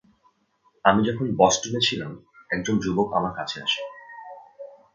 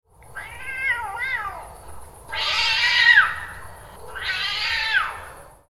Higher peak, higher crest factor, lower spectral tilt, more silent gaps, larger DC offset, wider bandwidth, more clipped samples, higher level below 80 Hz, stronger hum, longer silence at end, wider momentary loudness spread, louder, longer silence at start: about the same, -2 dBFS vs -2 dBFS; about the same, 24 dB vs 22 dB; first, -4 dB/octave vs 0 dB/octave; neither; neither; second, 9.2 kHz vs 16 kHz; neither; second, -56 dBFS vs -48 dBFS; neither; about the same, 0.2 s vs 0.2 s; about the same, 23 LU vs 24 LU; second, -23 LUFS vs -20 LUFS; first, 0.85 s vs 0.25 s